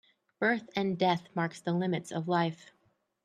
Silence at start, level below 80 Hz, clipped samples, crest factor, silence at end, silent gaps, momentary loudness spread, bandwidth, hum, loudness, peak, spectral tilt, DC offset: 0.4 s; -76 dBFS; under 0.1%; 18 dB; 0.55 s; none; 5 LU; 11 kHz; none; -31 LUFS; -14 dBFS; -6 dB/octave; under 0.1%